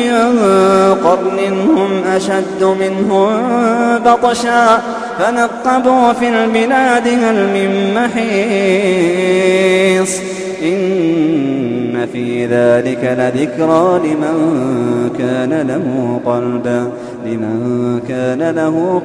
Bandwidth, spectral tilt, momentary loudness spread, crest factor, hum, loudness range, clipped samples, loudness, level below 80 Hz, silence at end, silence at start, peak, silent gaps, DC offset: 11 kHz; -5.5 dB/octave; 7 LU; 12 dB; none; 4 LU; under 0.1%; -13 LUFS; -52 dBFS; 0 s; 0 s; 0 dBFS; none; under 0.1%